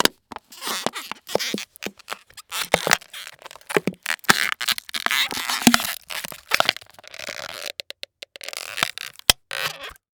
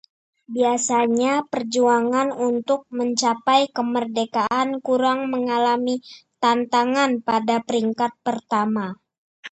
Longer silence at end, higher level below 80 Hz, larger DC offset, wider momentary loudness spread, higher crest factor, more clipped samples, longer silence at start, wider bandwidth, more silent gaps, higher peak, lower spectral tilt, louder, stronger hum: first, 0.25 s vs 0.05 s; first, -52 dBFS vs -70 dBFS; neither; first, 18 LU vs 6 LU; first, 26 dB vs 18 dB; neither; second, 0 s vs 0.5 s; first, over 20 kHz vs 8.8 kHz; second, none vs 9.18-9.43 s; first, 0 dBFS vs -4 dBFS; second, -1.5 dB/octave vs -3.5 dB/octave; about the same, -23 LUFS vs -21 LUFS; neither